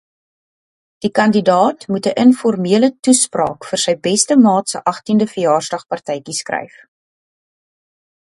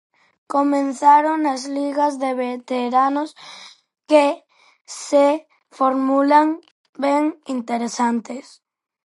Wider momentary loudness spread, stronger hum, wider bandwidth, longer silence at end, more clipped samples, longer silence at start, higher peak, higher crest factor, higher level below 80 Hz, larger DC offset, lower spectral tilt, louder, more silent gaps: second, 11 LU vs 17 LU; neither; about the same, 11.5 kHz vs 11.5 kHz; first, 1.65 s vs 0.65 s; neither; first, 1 s vs 0.5 s; about the same, 0 dBFS vs -2 dBFS; about the same, 16 dB vs 18 dB; first, -62 dBFS vs -78 dBFS; neither; about the same, -4 dB/octave vs -3.5 dB/octave; first, -15 LUFS vs -19 LUFS; second, 2.99-3.03 s vs 4.81-4.85 s, 6.71-6.93 s